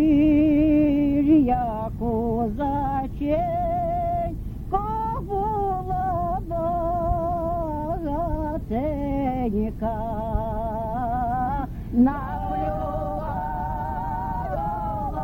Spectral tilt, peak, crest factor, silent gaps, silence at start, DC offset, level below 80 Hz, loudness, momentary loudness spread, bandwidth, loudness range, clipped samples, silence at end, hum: -10 dB/octave; -8 dBFS; 16 dB; none; 0 s; under 0.1%; -34 dBFS; -25 LUFS; 10 LU; 16.5 kHz; 4 LU; under 0.1%; 0 s; none